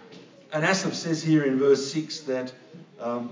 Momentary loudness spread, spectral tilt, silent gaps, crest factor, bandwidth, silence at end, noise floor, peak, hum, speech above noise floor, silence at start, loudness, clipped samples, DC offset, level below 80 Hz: 11 LU; -5 dB/octave; none; 18 dB; 7.6 kHz; 0 s; -48 dBFS; -8 dBFS; none; 23 dB; 0 s; -25 LUFS; under 0.1%; under 0.1%; -86 dBFS